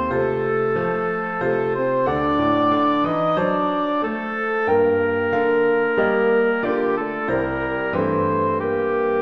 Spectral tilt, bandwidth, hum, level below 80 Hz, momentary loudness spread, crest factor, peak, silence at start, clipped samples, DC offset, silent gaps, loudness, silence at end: -8.5 dB/octave; 5.6 kHz; none; -50 dBFS; 5 LU; 12 dB; -8 dBFS; 0 s; under 0.1%; 0.3%; none; -20 LUFS; 0 s